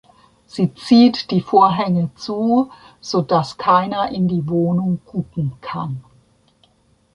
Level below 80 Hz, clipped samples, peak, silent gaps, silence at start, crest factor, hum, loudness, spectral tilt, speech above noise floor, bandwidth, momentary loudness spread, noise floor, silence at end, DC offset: -54 dBFS; under 0.1%; -2 dBFS; none; 0.55 s; 16 dB; none; -18 LUFS; -7.5 dB/octave; 41 dB; 10.5 kHz; 13 LU; -58 dBFS; 1.15 s; under 0.1%